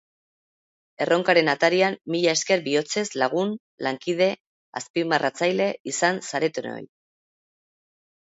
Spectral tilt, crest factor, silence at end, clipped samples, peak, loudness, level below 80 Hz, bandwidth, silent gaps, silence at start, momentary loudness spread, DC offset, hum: -3.5 dB/octave; 22 dB; 1.5 s; under 0.1%; -4 dBFS; -23 LUFS; -74 dBFS; 8 kHz; 3.60-3.78 s, 4.40-4.73 s, 4.90-4.94 s, 5.80-5.85 s; 1 s; 10 LU; under 0.1%; none